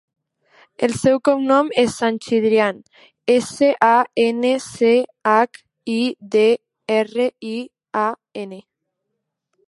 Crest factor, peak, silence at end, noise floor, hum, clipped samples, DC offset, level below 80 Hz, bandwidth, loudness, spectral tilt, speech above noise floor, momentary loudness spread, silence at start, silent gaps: 18 dB; 0 dBFS; 1.05 s; -78 dBFS; none; under 0.1%; under 0.1%; -62 dBFS; 11.5 kHz; -18 LUFS; -4.5 dB/octave; 60 dB; 13 LU; 0.8 s; none